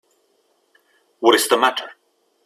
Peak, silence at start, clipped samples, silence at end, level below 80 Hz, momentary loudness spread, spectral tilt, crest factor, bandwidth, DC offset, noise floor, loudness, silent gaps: 0 dBFS; 1.2 s; under 0.1%; 0.55 s; -70 dBFS; 16 LU; -1 dB/octave; 22 dB; 16 kHz; under 0.1%; -64 dBFS; -17 LUFS; none